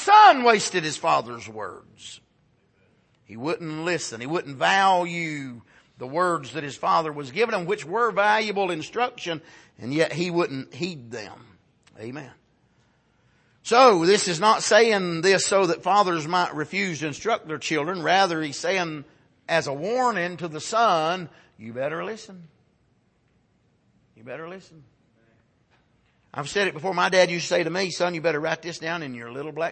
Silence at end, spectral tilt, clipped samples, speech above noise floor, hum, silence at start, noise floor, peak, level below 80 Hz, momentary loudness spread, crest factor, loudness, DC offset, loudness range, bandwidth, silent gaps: 0 s; -3.5 dB/octave; under 0.1%; 41 dB; none; 0 s; -65 dBFS; -2 dBFS; -70 dBFS; 19 LU; 22 dB; -23 LUFS; under 0.1%; 12 LU; 8.8 kHz; none